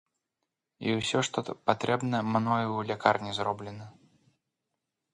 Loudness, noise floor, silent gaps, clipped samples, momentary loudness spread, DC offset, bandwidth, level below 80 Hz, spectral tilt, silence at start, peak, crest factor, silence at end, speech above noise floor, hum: -29 LUFS; -85 dBFS; none; under 0.1%; 8 LU; under 0.1%; 11 kHz; -66 dBFS; -5 dB/octave; 0.8 s; -6 dBFS; 24 dB; 1.25 s; 56 dB; none